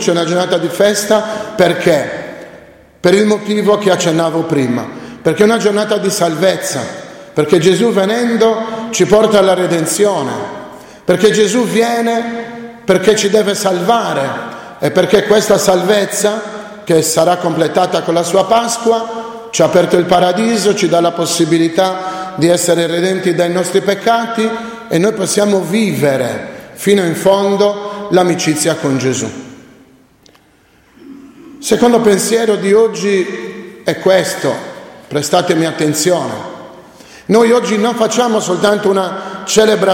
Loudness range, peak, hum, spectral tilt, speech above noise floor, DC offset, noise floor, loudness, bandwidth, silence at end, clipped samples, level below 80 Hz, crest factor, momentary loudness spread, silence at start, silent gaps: 3 LU; 0 dBFS; none; -4.5 dB/octave; 37 dB; under 0.1%; -49 dBFS; -13 LUFS; 16.5 kHz; 0 s; under 0.1%; -52 dBFS; 12 dB; 12 LU; 0 s; none